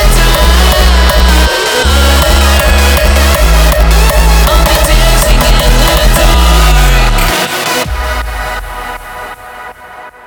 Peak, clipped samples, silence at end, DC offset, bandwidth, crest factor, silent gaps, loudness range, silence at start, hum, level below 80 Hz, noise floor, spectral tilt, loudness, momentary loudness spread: 0 dBFS; 0.1%; 0.15 s; under 0.1%; over 20 kHz; 8 dB; none; 4 LU; 0 s; none; -8 dBFS; -30 dBFS; -4 dB/octave; -8 LUFS; 14 LU